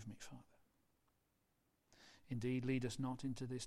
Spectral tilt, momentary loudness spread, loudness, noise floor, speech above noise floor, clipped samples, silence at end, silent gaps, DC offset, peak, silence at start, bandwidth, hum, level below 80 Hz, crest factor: -6 dB/octave; 19 LU; -44 LUFS; -82 dBFS; 40 dB; under 0.1%; 0 s; none; under 0.1%; -28 dBFS; 0 s; 13.5 kHz; none; -70 dBFS; 18 dB